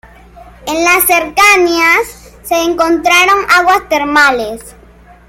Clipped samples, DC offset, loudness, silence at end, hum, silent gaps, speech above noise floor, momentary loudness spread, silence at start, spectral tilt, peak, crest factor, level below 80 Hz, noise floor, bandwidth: under 0.1%; under 0.1%; -9 LUFS; 0.6 s; none; none; 29 dB; 15 LU; 0.35 s; -1.5 dB/octave; 0 dBFS; 12 dB; -40 dBFS; -40 dBFS; 17 kHz